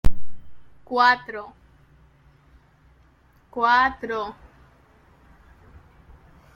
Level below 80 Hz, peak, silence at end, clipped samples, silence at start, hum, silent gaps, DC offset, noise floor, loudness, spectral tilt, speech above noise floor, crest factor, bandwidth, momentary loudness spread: -40 dBFS; -4 dBFS; 2.25 s; under 0.1%; 0.05 s; none; none; under 0.1%; -57 dBFS; -22 LUFS; -5 dB/octave; 36 dB; 20 dB; 7.4 kHz; 19 LU